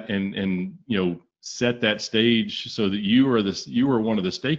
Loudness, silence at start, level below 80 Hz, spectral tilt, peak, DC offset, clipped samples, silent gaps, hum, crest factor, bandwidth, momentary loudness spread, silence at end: -23 LUFS; 0 s; -60 dBFS; -5.5 dB/octave; -6 dBFS; under 0.1%; under 0.1%; none; none; 18 dB; 7.8 kHz; 8 LU; 0 s